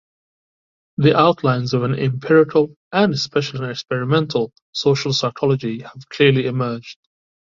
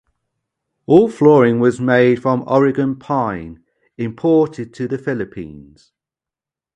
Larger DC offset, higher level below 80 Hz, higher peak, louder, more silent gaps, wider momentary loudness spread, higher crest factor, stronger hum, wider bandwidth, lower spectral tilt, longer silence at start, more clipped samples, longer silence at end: neither; about the same, -58 dBFS vs -54 dBFS; about the same, -2 dBFS vs 0 dBFS; about the same, -18 LUFS vs -16 LUFS; first, 2.76-2.91 s, 4.62-4.73 s vs none; second, 11 LU vs 17 LU; about the same, 18 dB vs 16 dB; neither; second, 7.6 kHz vs 9.8 kHz; second, -6 dB/octave vs -8 dB/octave; about the same, 1 s vs 0.9 s; neither; second, 0.65 s vs 1.15 s